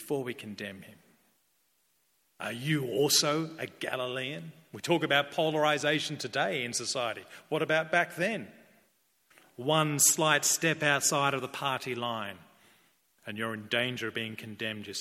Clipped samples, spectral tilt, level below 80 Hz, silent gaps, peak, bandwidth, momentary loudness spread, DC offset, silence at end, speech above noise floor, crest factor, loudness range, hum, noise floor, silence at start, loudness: under 0.1%; -2.5 dB/octave; -76 dBFS; none; -8 dBFS; 16.5 kHz; 16 LU; under 0.1%; 0 s; 42 dB; 22 dB; 6 LU; none; -73 dBFS; 0 s; -29 LUFS